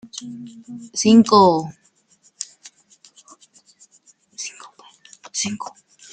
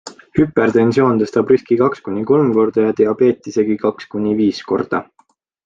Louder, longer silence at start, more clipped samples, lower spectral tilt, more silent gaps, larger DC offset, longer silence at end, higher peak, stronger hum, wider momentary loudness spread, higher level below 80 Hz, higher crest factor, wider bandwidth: about the same, -17 LUFS vs -16 LUFS; first, 0.2 s vs 0.05 s; neither; second, -4.5 dB/octave vs -7.5 dB/octave; neither; neither; second, 0.5 s vs 0.65 s; about the same, -2 dBFS vs 0 dBFS; neither; first, 24 LU vs 7 LU; second, -66 dBFS vs -52 dBFS; about the same, 20 dB vs 16 dB; first, 9.2 kHz vs 7.6 kHz